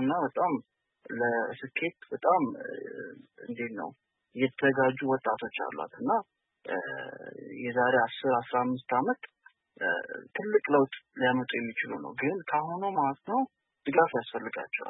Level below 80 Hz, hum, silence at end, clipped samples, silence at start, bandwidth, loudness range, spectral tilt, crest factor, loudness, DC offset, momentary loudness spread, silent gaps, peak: -80 dBFS; none; 0 s; under 0.1%; 0 s; 4.1 kHz; 3 LU; -9.5 dB/octave; 20 dB; -30 LUFS; under 0.1%; 14 LU; none; -10 dBFS